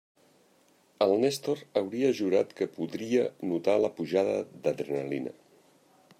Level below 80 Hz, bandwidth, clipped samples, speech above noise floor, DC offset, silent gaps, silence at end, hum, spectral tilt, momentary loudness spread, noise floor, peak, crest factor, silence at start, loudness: -78 dBFS; 15.5 kHz; under 0.1%; 36 dB; under 0.1%; none; 0.9 s; none; -5.5 dB/octave; 7 LU; -64 dBFS; -12 dBFS; 18 dB; 1 s; -29 LUFS